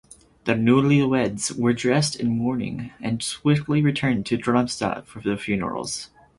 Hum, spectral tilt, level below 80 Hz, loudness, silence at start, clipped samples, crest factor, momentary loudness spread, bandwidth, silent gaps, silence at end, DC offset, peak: none; -5.5 dB/octave; -52 dBFS; -23 LUFS; 0.45 s; under 0.1%; 18 dB; 10 LU; 11.5 kHz; none; 0.35 s; under 0.1%; -4 dBFS